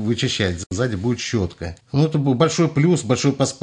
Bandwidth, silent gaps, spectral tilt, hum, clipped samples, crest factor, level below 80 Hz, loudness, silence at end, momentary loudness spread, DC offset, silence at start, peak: 10.5 kHz; 0.66-0.70 s; -5.5 dB/octave; none; under 0.1%; 16 dB; -50 dBFS; -20 LUFS; 0.05 s; 6 LU; under 0.1%; 0 s; -4 dBFS